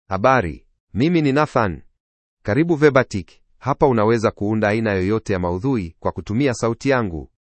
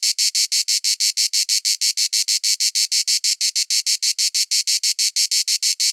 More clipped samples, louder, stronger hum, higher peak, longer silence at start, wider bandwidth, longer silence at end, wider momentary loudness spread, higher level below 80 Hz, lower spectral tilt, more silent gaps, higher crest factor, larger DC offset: neither; about the same, -19 LUFS vs -17 LUFS; neither; first, 0 dBFS vs -4 dBFS; about the same, 0.1 s vs 0 s; second, 8.8 kHz vs 16.5 kHz; first, 0.2 s vs 0 s; first, 12 LU vs 1 LU; first, -46 dBFS vs under -90 dBFS; first, -7 dB/octave vs 14.5 dB/octave; first, 0.80-0.87 s, 2.00-2.37 s vs none; about the same, 18 dB vs 16 dB; neither